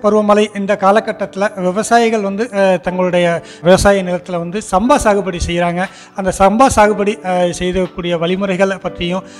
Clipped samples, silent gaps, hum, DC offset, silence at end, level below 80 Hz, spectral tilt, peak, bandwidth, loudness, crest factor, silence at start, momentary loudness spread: under 0.1%; none; none; under 0.1%; 0 s; -34 dBFS; -5 dB/octave; 0 dBFS; 13.5 kHz; -14 LUFS; 14 dB; 0 s; 10 LU